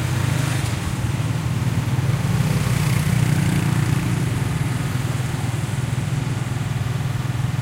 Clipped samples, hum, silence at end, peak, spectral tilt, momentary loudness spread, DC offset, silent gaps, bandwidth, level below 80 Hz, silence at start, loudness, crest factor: under 0.1%; none; 0 s; -6 dBFS; -6 dB/octave; 5 LU; under 0.1%; none; 16 kHz; -38 dBFS; 0 s; -22 LUFS; 14 dB